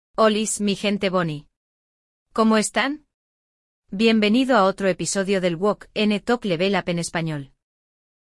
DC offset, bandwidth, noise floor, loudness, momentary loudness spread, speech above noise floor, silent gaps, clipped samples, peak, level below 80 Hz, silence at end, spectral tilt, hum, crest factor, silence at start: under 0.1%; 12 kHz; under -90 dBFS; -21 LUFS; 10 LU; over 69 dB; 1.57-2.26 s, 3.14-3.82 s; under 0.1%; -4 dBFS; -56 dBFS; 0.85 s; -4.5 dB/octave; none; 18 dB; 0.2 s